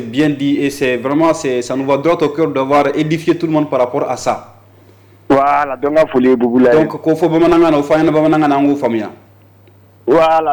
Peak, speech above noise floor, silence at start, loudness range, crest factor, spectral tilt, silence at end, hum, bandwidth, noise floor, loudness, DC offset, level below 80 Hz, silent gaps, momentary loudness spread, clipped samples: -4 dBFS; 32 dB; 0 s; 4 LU; 10 dB; -6.5 dB/octave; 0 s; none; 19 kHz; -45 dBFS; -13 LUFS; under 0.1%; -46 dBFS; none; 7 LU; under 0.1%